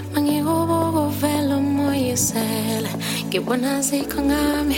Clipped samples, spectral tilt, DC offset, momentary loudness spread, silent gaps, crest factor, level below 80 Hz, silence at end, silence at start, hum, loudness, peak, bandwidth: under 0.1%; -4.5 dB/octave; under 0.1%; 3 LU; none; 14 dB; -42 dBFS; 0 s; 0 s; none; -21 LUFS; -6 dBFS; 17 kHz